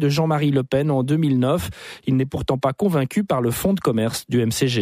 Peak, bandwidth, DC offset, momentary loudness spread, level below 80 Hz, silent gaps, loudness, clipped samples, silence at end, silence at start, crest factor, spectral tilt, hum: -8 dBFS; 15.5 kHz; under 0.1%; 4 LU; -46 dBFS; none; -21 LUFS; under 0.1%; 0 s; 0 s; 12 dB; -6 dB/octave; none